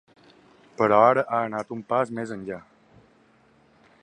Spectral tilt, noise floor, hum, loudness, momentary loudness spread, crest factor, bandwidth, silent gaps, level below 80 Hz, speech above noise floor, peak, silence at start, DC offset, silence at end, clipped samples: -7 dB/octave; -59 dBFS; none; -23 LUFS; 17 LU; 22 dB; 10.5 kHz; none; -66 dBFS; 36 dB; -4 dBFS; 0.8 s; under 0.1%; 1.45 s; under 0.1%